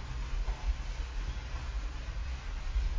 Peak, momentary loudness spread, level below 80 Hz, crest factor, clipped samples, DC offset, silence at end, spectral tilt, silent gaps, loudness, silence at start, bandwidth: -20 dBFS; 3 LU; -36 dBFS; 14 dB; under 0.1%; under 0.1%; 0 s; -5 dB/octave; none; -40 LUFS; 0 s; 7.6 kHz